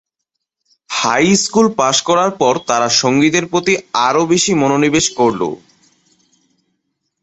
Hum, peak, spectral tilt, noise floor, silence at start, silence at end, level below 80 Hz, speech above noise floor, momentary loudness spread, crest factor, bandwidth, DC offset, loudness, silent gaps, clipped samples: none; 0 dBFS; -3.5 dB/octave; -77 dBFS; 0.9 s; 1.65 s; -52 dBFS; 63 dB; 4 LU; 14 dB; 8.4 kHz; under 0.1%; -14 LUFS; none; under 0.1%